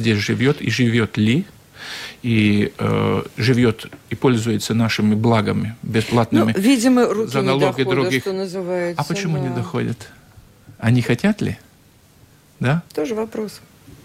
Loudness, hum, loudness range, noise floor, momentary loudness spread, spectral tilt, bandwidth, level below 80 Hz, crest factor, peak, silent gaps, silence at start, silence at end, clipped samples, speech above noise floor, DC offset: -19 LUFS; none; 6 LU; -51 dBFS; 11 LU; -6 dB/octave; 15.5 kHz; -50 dBFS; 14 dB; -4 dBFS; none; 0 s; 0.45 s; under 0.1%; 33 dB; under 0.1%